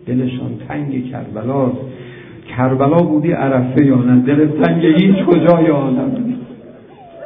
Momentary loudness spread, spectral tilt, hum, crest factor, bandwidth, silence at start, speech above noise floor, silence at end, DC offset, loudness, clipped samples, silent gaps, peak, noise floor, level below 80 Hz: 15 LU; -11.5 dB/octave; none; 14 dB; 3.8 kHz; 0.05 s; 25 dB; 0 s; under 0.1%; -14 LUFS; under 0.1%; none; 0 dBFS; -38 dBFS; -50 dBFS